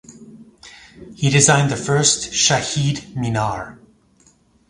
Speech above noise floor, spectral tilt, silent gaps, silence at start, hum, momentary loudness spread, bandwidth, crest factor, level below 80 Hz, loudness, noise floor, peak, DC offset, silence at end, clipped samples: 38 dB; -3.5 dB/octave; none; 0.1 s; none; 11 LU; 11.5 kHz; 20 dB; -48 dBFS; -17 LUFS; -55 dBFS; 0 dBFS; under 0.1%; 0.95 s; under 0.1%